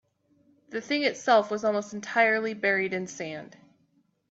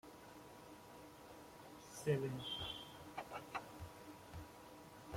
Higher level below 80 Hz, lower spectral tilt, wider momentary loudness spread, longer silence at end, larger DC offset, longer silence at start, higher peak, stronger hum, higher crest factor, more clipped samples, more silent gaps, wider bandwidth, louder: second, -76 dBFS vs -70 dBFS; about the same, -4 dB/octave vs -5 dB/octave; second, 14 LU vs 17 LU; first, 0.85 s vs 0 s; neither; first, 0.7 s vs 0.05 s; first, -10 dBFS vs -24 dBFS; neither; about the same, 20 dB vs 24 dB; neither; neither; second, 8 kHz vs 16.5 kHz; first, -26 LUFS vs -49 LUFS